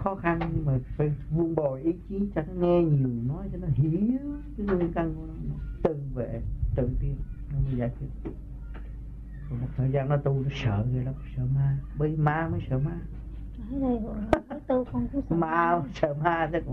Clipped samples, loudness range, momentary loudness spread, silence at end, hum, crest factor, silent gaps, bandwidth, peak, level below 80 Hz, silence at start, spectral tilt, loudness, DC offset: under 0.1%; 5 LU; 13 LU; 0 s; none; 24 dB; none; 6.2 kHz; -4 dBFS; -38 dBFS; 0 s; -9.5 dB/octave; -29 LUFS; under 0.1%